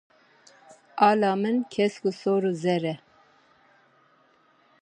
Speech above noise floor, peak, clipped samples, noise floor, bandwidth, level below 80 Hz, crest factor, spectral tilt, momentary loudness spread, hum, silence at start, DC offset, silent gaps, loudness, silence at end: 38 dB; -6 dBFS; under 0.1%; -62 dBFS; 9.6 kHz; -76 dBFS; 22 dB; -6.5 dB/octave; 11 LU; none; 0.95 s; under 0.1%; none; -25 LUFS; 1.85 s